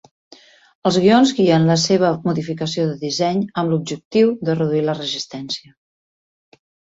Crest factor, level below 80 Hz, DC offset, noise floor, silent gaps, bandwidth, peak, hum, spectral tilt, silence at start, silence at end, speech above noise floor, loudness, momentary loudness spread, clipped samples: 16 dB; -58 dBFS; under 0.1%; under -90 dBFS; 4.05-4.11 s; 8 kHz; -2 dBFS; none; -5.5 dB/octave; 0.85 s; 1.35 s; over 73 dB; -18 LUFS; 11 LU; under 0.1%